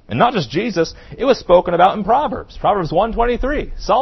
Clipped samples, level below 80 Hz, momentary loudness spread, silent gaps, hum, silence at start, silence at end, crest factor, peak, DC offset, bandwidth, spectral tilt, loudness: under 0.1%; -32 dBFS; 8 LU; none; none; 0.1 s; 0 s; 16 dB; 0 dBFS; under 0.1%; 6.2 kHz; -6 dB/octave; -17 LUFS